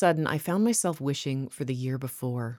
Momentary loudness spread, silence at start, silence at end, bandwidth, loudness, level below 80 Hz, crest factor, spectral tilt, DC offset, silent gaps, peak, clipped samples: 8 LU; 0 s; 0 s; 19 kHz; -28 LUFS; -68 dBFS; 18 dB; -5 dB/octave; under 0.1%; none; -10 dBFS; under 0.1%